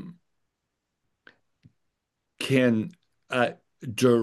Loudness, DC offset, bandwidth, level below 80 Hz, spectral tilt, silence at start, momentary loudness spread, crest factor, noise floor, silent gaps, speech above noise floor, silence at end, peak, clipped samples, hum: -26 LUFS; under 0.1%; 12.5 kHz; -74 dBFS; -6 dB/octave; 0 s; 16 LU; 22 dB; -82 dBFS; none; 59 dB; 0 s; -6 dBFS; under 0.1%; none